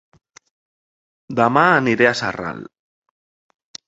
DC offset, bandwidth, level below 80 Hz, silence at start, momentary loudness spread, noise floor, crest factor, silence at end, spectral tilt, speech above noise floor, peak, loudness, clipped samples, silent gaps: under 0.1%; 8.2 kHz; -58 dBFS; 1.3 s; 15 LU; under -90 dBFS; 22 dB; 1.25 s; -5.5 dB/octave; over 73 dB; 0 dBFS; -17 LUFS; under 0.1%; none